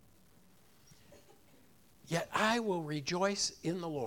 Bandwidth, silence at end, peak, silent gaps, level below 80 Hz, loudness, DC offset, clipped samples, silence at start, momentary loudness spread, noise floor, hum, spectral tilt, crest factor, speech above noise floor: 18 kHz; 0 s; -16 dBFS; none; -70 dBFS; -34 LUFS; under 0.1%; under 0.1%; 1.1 s; 7 LU; -65 dBFS; none; -3.5 dB/octave; 22 dB; 31 dB